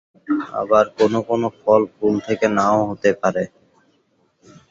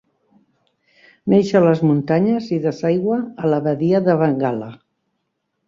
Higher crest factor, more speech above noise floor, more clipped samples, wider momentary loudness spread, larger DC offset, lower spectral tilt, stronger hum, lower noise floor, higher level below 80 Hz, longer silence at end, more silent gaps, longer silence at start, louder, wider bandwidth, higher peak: about the same, 18 dB vs 16 dB; second, 45 dB vs 56 dB; neither; about the same, 7 LU vs 7 LU; neither; second, -6.5 dB/octave vs -8.5 dB/octave; neither; second, -63 dBFS vs -73 dBFS; about the same, -58 dBFS vs -60 dBFS; first, 1.25 s vs 0.95 s; neither; second, 0.3 s vs 1.25 s; about the same, -19 LUFS vs -18 LUFS; about the same, 7.8 kHz vs 7.4 kHz; about the same, -2 dBFS vs -2 dBFS